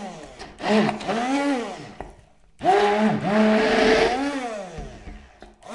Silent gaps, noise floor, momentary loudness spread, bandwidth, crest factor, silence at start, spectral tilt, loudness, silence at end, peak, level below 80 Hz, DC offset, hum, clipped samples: none; -51 dBFS; 21 LU; 11.5 kHz; 18 dB; 0 s; -5 dB/octave; -21 LUFS; 0 s; -6 dBFS; -46 dBFS; under 0.1%; none; under 0.1%